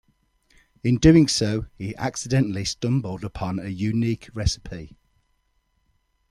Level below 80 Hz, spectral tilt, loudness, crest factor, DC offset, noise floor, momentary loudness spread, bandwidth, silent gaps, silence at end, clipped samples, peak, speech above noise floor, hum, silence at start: -40 dBFS; -5.5 dB/octave; -23 LUFS; 22 dB; under 0.1%; -69 dBFS; 16 LU; 12.5 kHz; none; 1.45 s; under 0.1%; -2 dBFS; 47 dB; none; 0.85 s